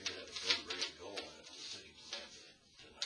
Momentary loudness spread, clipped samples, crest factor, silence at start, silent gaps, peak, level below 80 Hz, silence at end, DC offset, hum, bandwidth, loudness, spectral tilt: 22 LU; under 0.1%; 28 dB; 0 s; none; -16 dBFS; -76 dBFS; 0 s; under 0.1%; none; 11 kHz; -41 LUFS; 0 dB/octave